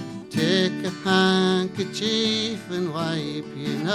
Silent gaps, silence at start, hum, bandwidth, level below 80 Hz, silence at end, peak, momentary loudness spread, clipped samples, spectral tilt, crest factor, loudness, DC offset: none; 0 s; none; 13.5 kHz; -62 dBFS; 0 s; -8 dBFS; 10 LU; under 0.1%; -5 dB/octave; 16 dB; -23 LUFS; under 0.1%